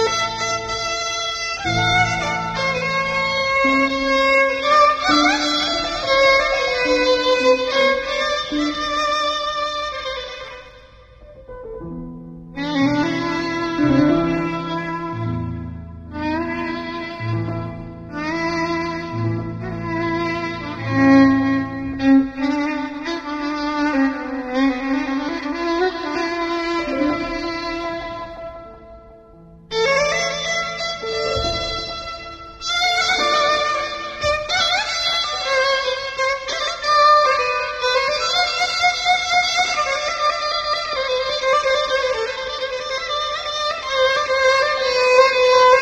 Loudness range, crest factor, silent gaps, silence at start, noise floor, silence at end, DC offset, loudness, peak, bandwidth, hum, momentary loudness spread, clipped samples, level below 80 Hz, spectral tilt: 8 LU; 18 dB; none; 0 s; -45 dBFS; 0 s; under 0.1%; -19 LUFS; -2 dBFS; 12 kHz; none; 12 LU; under 0.1%; -44 dBFS; -4 dB/octave